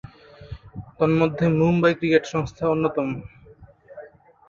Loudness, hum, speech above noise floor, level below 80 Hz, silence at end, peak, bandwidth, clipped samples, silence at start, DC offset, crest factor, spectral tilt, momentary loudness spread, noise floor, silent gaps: -21 LUFS; none; 28 dB; -50 dBFS; 0.4 s; -4 dBFS; 7.4 kHz; under 0.1%; 0.4 s; under 0.1%; 20 dB; -7.5 dB/octave; 23 LU; -49 dBFS; none